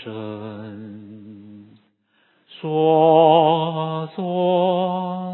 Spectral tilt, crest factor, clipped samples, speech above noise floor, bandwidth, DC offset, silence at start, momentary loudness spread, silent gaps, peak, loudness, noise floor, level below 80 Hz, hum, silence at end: -11.5 dB/octave; 18 dB; under 0.1%; 45 dB; 4.2 kHz; under 0.1%; 0 s; 23 LU; none; -2 dBFS; -18 LUFS; -63 dBFS; -72 dBFS; none; 0 s